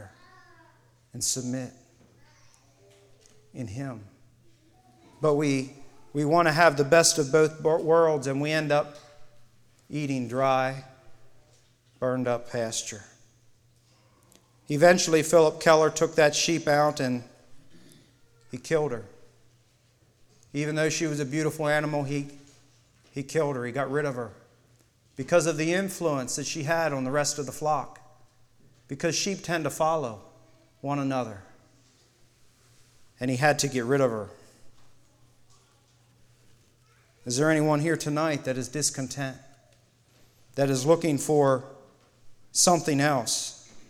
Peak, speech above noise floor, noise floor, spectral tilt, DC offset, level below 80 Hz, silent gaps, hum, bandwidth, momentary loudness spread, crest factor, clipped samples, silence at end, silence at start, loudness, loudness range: -6 dBFS; 38 dB; -63 dBFS; -4 dB/octave; under 0.1%; -64 dBFS; none; none; 17 kHz; 17 LU; 22 dB; under 0.1%; 0.05 s; 0 s; -25 LUFS; 12 LU